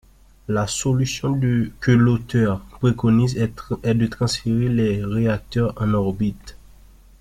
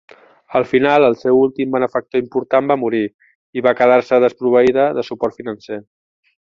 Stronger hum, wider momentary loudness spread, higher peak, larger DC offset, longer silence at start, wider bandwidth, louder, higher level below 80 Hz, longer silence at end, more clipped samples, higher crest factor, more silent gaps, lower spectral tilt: neither; second, 7 LU vs 14 LU; about the same, -4 dBFS vs -2 dBFS; neither; about the same, 0.5 s vs 0.5 s; first, 13.5 kHz vs 7.2 kHz; second, -21 LUFS vs -16 LUFS; first, -42 dBFS vs -58 dBFS; about the same, 0.65 s vs 0.7 s; neither; about the same, 18 dB vs 14 dB; second, none vs 3.14-3.19 s, 3.35-3.53 s; about the same, -6.5 dB/octave vs -7 dB/octave